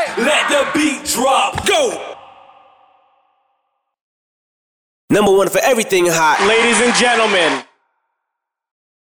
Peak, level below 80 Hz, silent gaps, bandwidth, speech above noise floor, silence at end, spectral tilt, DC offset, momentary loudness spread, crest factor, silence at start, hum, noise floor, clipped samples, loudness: -4 dBFS; -50 dBFS; 4.01-5.08 s; 19 kHz; 65 dB; 1.55 s; -2.5 dB/octave; under 0.1%; 6 LU; 14 dB; 0 s; none; -79 dBFS; under 0.1%; -13 LUFS